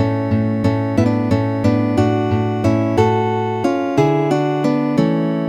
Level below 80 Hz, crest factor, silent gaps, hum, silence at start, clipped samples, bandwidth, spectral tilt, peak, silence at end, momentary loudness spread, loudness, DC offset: -46 dBFS; 14 dB; none; none; 0 s; under 0.1%; 9.6 kHz; -8 dB/octave; -2 dBFS; 0 s; 3 LU; -17 LUFS; under 0.1%